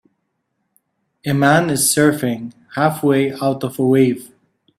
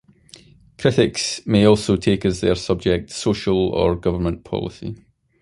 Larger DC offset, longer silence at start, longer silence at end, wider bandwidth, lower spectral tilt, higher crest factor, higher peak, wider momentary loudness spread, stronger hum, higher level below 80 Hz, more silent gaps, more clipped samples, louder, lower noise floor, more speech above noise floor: neither; first, 1.25 s vs 0.8 s; about the same, 0.55 s vs 0.45 s; first, 16 kHz vs 11.5 kHz; about the same, -5 dB/octave vs -5.5 dB/octave; about the same, 18 dB vs 18 dB; about the same, 0 dBFS vs -2 dBFS; about the same, 13 LU vs 11 LU; neither; second, -58 dBFS vs -38 dBFS; neither; neither; first, -16 LUFS vs -20 LUFS; first, -71 dBFS vs -48 dBFS; first, 56 dB vs 29 dB